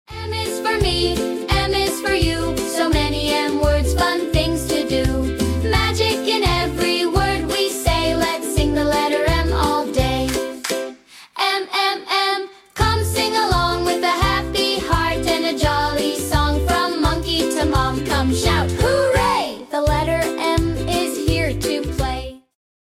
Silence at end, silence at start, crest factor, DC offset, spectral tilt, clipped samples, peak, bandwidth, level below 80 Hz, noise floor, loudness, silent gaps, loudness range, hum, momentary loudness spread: 0.5 s; 0.1 s; 16 dB; under 0.1%; -4.5 dB/octave; under 0.1%; -4 dBFS; 16.5 kHz; -28 dBFS; -39 dBFS; -19 LUFS; none; 2 LU; none; 4 LU